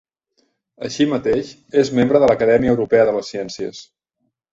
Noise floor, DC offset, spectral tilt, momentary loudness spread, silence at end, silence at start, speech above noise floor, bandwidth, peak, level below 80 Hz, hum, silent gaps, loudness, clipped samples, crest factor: -73 dBFS; under 0.1%; -6 dB/octave; 15 LU; 0.7 s; 0.8 s; 56 dB; 7.8 kHz; 0 dBFS; -50 dBFS; none; none; -17 LUFS; under 0.1%; 18 dB